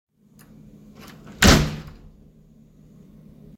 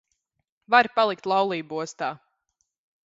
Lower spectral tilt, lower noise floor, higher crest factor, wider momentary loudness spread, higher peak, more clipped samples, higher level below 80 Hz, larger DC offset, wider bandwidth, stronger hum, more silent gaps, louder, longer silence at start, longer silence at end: about the same, -4 dB/octave vs -4 dB/octave; second, -52 dBFS vs -77 dBFS; about the same, 24 dB vs 24 dB; first, 29 LU vs 13 LU; about the same, 0 dBFS vs -2 dBFS; neither; first, -32 dBFS vs -76 dBFS; neither; first, 16.5 kHz vs 8 kHz; neither; neither; first, -17 LUFS vs -24 LUFS; first, 1.4 s vs 0.7 s; first, 1.7 s vs 0.9 s